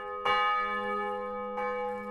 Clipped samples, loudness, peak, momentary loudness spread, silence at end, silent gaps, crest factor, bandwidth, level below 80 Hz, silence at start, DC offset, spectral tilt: under 0.1%; -31 LUFS; -14 dBFS; 8 LU; 0 s; none; 16 dB; 12.5 kHz; -62 dBFS; 0 s; under 0.1%; -4.5 dB/octave